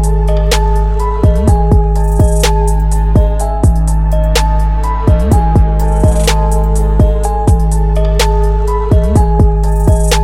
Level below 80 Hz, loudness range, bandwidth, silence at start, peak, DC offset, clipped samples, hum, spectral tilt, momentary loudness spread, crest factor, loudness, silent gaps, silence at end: -10 dBFS; 0 LU; 15 kHz; 0 s; 0 dBFS; 2%; under 0.1%; none; -6 dB/octave; 3 LU; 10 dB; -12 LUFS; none; 0 s